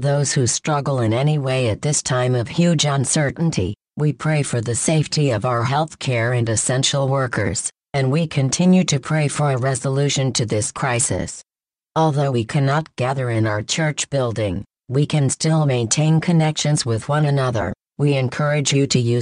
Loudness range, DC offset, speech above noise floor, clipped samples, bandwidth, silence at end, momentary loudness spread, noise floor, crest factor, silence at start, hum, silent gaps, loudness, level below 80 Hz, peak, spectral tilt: 2 LU; under 0.1%; 31 dB; under 0.1%; 11 kHz; 0 s; 5 LU; -49 dBFS; 16 dB; 0 s; none; none; -19 LUFS; -50 dBFS; -2 dBFS; -5 dB/octave